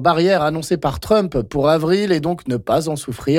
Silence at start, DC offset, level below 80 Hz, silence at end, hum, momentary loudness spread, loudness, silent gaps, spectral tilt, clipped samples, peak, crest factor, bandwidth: 0 s; under 0.1%; -40 dBFS; 0 s; none; 7 LU; -18 LUFS; none; -6 dB/octave; under 0.1%; -4 dBFS; 12 dB; 16.5 kHz